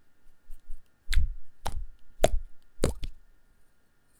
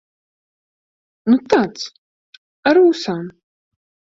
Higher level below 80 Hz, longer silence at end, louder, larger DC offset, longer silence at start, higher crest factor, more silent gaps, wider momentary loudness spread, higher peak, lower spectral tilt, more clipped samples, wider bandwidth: first, -34 dBFS vs -62 dBFS; first, 1.05 s vs 0.85 s; second, -34 LUFS vs -17 LUFS; neither; second, 0.25 s vs 1.25 s; first, 24 dB vs 18 dB; second, none vs 1.98-2.63 s; first, 24 LU vs 17 LU; about the same, -4 dBFS vs -2 dBFS; about the same, -4.5 dB/octave vs -5.5 dB/octave; neither; first, 13.5 kHz vs 7.8 kHz